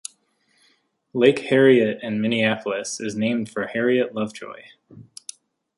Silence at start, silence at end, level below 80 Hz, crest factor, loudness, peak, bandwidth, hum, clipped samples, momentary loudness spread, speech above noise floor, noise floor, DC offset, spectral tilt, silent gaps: 1.15 s; 0.75 s; -68 dBFS; 20 dB; -21 LUFS; -2 dBFS; 11.5 kHz; none; under 0.1%; 22 LU; 44 dB; -65 dBFS; under 0.1%; -5 dB/octave; none